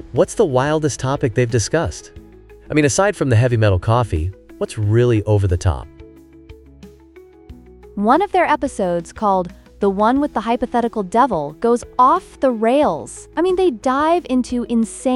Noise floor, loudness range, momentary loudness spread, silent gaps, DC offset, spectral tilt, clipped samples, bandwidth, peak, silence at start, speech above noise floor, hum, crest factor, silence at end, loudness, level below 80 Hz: -44 dBFS; 4 LU; 7 LU; none; under 0.1%; -6 dB/octave; under 0.1%; 12 kHz; -2 dBFS; 0 s; 27 dB; none; 16 dB; 0 s; -18 LUFS; -38 dBFS